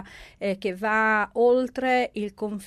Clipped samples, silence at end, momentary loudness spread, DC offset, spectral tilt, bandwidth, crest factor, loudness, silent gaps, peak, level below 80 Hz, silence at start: under 0.1%; 0 s; 10 LU; under 0.1%; -5.5 dB/octave; 13 kHz; 14 dB; -24 LUFS; none; -10 dBFS; -58 dBFS; 0 s